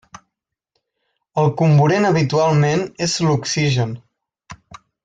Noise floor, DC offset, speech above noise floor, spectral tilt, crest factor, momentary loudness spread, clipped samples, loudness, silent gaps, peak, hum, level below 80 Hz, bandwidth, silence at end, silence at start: -79 dBFS; under 0.1%; 63 dB; -5.5 dB/octave; 14 dB; 8 LU; under 0.1%; -17 LUFS; none; -4 dBFS; none; -54 dBFS; 9.2 kHz; 0.3 s; 1.35 s